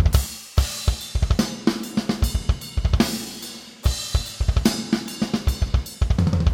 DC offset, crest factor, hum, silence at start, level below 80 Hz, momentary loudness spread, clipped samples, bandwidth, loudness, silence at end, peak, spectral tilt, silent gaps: under 0.1%; 20 dB; none; 0 s; -26 dBFS; 5 LU; under 0.1%; 17 kHz; -24 LUFS; 0 s; -2 dBFS; -5 dB/octave; none